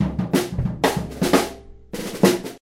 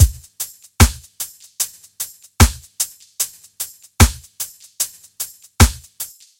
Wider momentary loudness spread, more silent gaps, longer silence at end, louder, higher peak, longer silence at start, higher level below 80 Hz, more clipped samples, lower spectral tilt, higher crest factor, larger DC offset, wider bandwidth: about the same, 12 LU vs 14 LU; neither; second, 0.05 s vs 0.35 s; about the same, -21 LUFS vs -20 LUFS; about the same, 0 dBFS vs 0 dBFS; about the same, 0 s vs 0 s; second, -38 dBFS vs -24 dBFS; neither; first, -5 dB/octave vs -3.5 dB/octave; about the same, 20 dB vs 20 dB; neither; about the same, 16 kHz vs 17.5 kHz